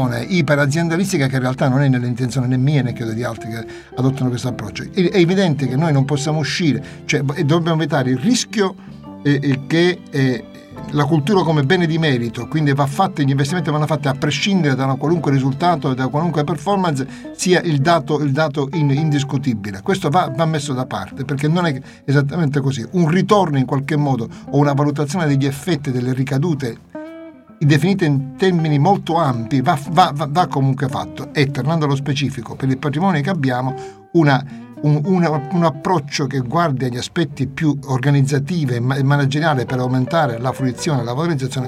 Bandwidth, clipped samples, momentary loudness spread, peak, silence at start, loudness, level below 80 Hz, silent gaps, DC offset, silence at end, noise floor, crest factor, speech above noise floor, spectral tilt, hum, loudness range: 13 kHz; under 0.1%; 8 LU; 0 dBFS; 0 s; -18 LUFS; -52 dBFS; none; under 0.1%; 0 s; -37 dBFS; 16 dB; 20 dB; -6.5 dB/octave; none; 2 LU